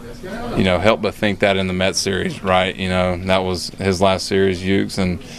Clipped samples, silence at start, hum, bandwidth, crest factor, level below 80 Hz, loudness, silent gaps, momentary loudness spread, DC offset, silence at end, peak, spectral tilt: under 0.1%; 0 s; none; 14 kHz; 18 dB; -40 dBFS; -18 LUFS; none; 5 LU; under 0.1%; 0 s; 0 dBFS; -5 dB/octave